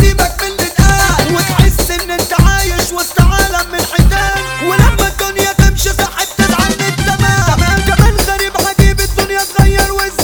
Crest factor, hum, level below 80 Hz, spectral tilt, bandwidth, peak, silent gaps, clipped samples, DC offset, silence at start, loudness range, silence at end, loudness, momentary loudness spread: 10 dB; none; -16 dBFS; -4 dB/octave; over 20 kHz; 0 dBFS; none; 0.6%; 0.5%; 0 s; 1 LU; 0 s; -11 LUFS; 4 LU